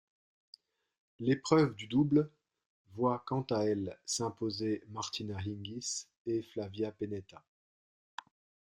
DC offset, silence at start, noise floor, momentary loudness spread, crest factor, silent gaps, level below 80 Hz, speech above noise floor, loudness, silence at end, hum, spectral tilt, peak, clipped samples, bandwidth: under 0.1%; 1.2 s; under -90 dBFS; 13 LU; 24 dB; 2.66-2.85 s, 6.17-6.25 s; -70 dBFS; over 56 dB; -34 LUFS; 1.4 s; none; -5.5 dB/octave; -12 dBFS; under 0.1%; 13.5 kHz